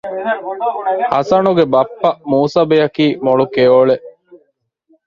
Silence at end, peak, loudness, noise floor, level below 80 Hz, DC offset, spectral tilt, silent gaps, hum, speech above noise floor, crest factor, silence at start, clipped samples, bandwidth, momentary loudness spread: 0.7 s; 0 dBFS; -14 LUFS; -61 dBFS; -56 dBFS; under 0.1%; -7 dB/octave; none; none; 48 dB; 14 dB; 0.05 s; under 0.1%; 7.2 kHz; 9 LU